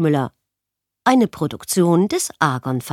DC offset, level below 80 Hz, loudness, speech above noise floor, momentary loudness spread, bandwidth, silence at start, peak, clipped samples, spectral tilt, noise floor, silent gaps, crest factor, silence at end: under 0.1%; -58 dBFS; -19 LUFS; 65 dB; 8 LU; 16.5 kHz; 0 s; -2 dBFS; under 0.1%; -5.5 dB/octave; -83 dBFS; none; 18 dB; 0 s